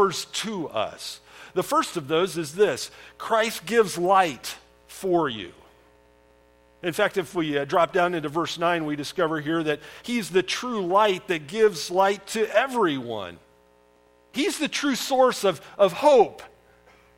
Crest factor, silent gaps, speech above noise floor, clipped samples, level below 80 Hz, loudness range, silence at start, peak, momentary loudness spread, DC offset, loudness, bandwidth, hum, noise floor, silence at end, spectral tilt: 20 dB; none; 35 dB; under 0.1%; -64 dBFS; 4 LU; 0 s; -6 dBFS; 13 LU; under 0.1%; -24 LUFS; 16.5 kHz; 60 Hz at -60 dBFS; -59 dBFS; 0.7 s; -4 dB/octave